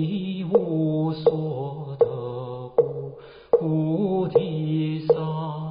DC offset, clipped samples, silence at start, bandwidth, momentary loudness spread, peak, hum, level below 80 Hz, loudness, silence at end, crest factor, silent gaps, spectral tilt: under 0.1%; under 0.1%; 0 s; 5.2 kHz; 10 LU; -6 dBFS; none; -60 dBFS; -24 LUFS; 0 s; 18 dB; none; -8.5 dB/octave